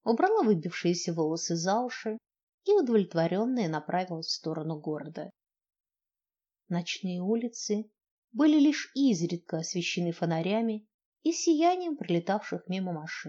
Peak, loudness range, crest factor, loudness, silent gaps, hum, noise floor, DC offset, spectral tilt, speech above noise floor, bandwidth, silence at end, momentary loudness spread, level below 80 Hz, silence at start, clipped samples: -12 dBFS; 7 LU; 18 dB; -29 LUFS; 2.43-2.47 s, 2.54-2.58 s, 8.11-8.22 s, 10.94-10.99 s, 11.05-11.12 s; none; under -90 dBFS; under 0.1%; -5 dB/octave; over 61 dB; 8 kHz; 0 s; 11 LU; under -90 dBFS; 0.05 s; under 0.1%